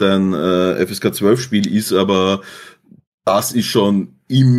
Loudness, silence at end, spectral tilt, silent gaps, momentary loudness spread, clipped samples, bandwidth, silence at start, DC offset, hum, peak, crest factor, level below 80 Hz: -16 LUFS; 0 s; -5.5 dB/octave; 3.07-3.18 s; 5 LU; under 0.1%; 15.5 kHz; 0 s; under 0.1%; none; -2 dBFS; 14 dB; -58 dBFS